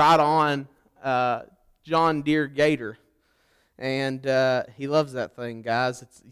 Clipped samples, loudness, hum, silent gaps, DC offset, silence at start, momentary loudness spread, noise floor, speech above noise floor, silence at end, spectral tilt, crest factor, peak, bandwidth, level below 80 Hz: under 0.1%; -24 LUFS; none; none; under 0.1%; 0 s; 11 LU; -66 dBFS; 42 dB; 0.3 s; -5.5 dB/octave; 14 dB; -10 dBFS; 15 kHz; -62 dBFS